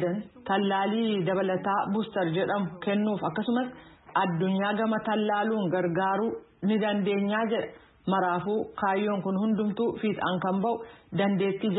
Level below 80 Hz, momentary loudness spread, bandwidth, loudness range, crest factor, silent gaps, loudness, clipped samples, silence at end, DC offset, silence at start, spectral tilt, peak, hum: -66 dBFS; 5 LU; 4.1 kHz; 1 LU; 16 dB; none; -28 LUFS; under 0.1%; 0 s; under 0.1%; 0 s; -11 dB/octave; -12 dBFS; none